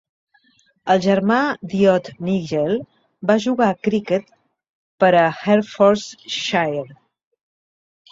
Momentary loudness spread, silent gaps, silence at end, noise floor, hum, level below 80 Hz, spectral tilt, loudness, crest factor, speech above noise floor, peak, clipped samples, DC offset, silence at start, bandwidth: 9 LU; 4.69-4.98 s; 1.15 s; -60 dBFS; none; -60 dBFS; -6 dB/octave; -19 LUFS; 18 dB; 42 dB; -2 dBFS; under 0.1%; under 0.1%; 0.85 s; 7.8 kHz